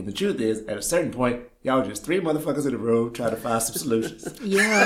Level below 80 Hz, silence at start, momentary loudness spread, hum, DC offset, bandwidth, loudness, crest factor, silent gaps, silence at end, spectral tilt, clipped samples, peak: -52 dBFS; 0 s; 4 LU; none; under 0.1%; 16.5 kHz; -25 LUFS; 20 dB; none; 0 s; -4 dB/octave; under 0.1%; -4 dBFS